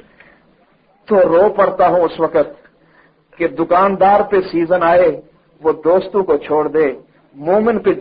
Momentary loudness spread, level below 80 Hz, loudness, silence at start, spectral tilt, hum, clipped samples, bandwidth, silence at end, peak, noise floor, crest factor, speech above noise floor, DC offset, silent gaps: 9 LU; -50 dBFS; -14 LUFS; 1.1 s; -10.5 dB/octave; none; under 0.1%; 5.2 kHz; 0 s; -2 dBFS; -54 dBFS; 12 dB; 41 dB; under 0.1%; none